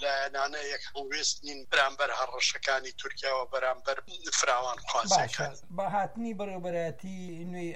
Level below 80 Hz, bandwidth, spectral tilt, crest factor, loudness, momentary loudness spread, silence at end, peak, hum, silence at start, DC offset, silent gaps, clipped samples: -62 dBFS; 13.5 kHz; -2 dB/octave; 20 dB; -31 LUFS; 10 LU; 0 s; -10 dBFS; none; 0 s; 0.7%; none; under 0.1%